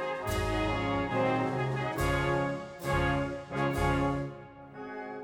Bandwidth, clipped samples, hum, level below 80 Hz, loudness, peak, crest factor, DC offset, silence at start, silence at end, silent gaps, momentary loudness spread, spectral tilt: 17 kHz; under 0.1%; none; -44 dBFS; -31 LUFS; -16 dBFS; 14 dB; under 0.1%; 0 s; 0 s; none; 12 LU; -6 dB/octave